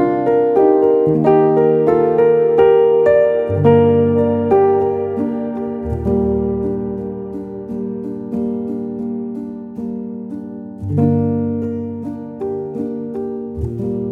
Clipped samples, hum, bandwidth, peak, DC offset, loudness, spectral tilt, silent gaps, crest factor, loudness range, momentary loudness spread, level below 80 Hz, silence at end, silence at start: under 0.1%; none; 3.8 kHz; -2 dBFS; under 0.1%; -16 LUFS; -10.5 dB/octave; none; 14 dB; 12 LU; 15 LU; -40 dBFS; 0 s; 0 s